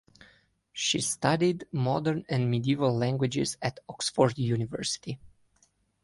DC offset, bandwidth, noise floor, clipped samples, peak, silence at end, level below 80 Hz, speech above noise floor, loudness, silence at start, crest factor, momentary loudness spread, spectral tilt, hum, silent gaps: under 0.1%; 11.5 kHz; -68 dBFS; under 0.1%; -8 dBFS; 0.75 s; -62 dBFS; 40 dB; -28 LUFS; 0.75 s; 20 dB; 9 LU; -5 dB/octave; none; none